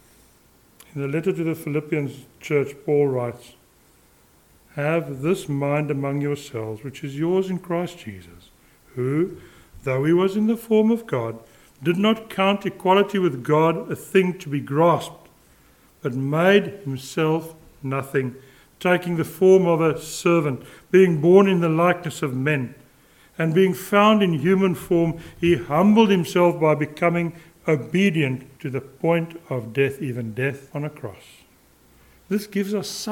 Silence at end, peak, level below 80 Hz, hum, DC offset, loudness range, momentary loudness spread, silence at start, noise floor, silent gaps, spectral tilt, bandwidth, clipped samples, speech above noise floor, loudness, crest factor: 0 s; -4 dBFS; -58 dBFS; none; under 0.1%; 8 LU; 15 LU; 0.95 s; -56 dBFS; none; -6.5 dB/octave; 17.5 kHz; under 0.1%; 35 dB; -21 LUFS; 18 dB